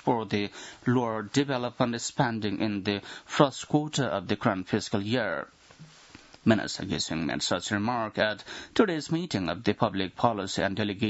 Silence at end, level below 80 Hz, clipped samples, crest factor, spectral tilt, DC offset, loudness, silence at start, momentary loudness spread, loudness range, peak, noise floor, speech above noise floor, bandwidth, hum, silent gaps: 0 s; -62 dBFS; under 0.1%; 24 dB; -5 dB/octave; under 0.1%; -28 LUFS; 0.05 s; 6 LU; 2 LU; -4 dBFS; -52 dBFS; 24 dB; 8 kHz; none; none